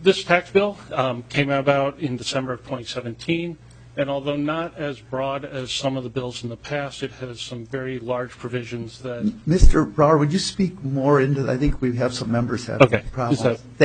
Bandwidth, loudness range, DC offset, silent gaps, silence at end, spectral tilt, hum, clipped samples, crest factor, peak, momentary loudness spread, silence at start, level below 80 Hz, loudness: 9.4 kHz; 8 LU; under 0.1%; none; 0 s; -6 dB/octave; none; under 0.1%; 22 dB; 0 dBFS; 13 LU; 0 s; -30 dBFS; -23 LUFS